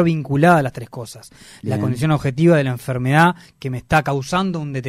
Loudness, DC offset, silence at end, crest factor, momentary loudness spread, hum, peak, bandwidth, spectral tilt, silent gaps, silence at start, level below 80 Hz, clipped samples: -18 LUFS; under 0.1%; 0 s; 16 dB; 16 LU; none; -2 dBFS; 15 kHz; -7 dB/octave; none; 0 s; -46 dBFS; under 0.1%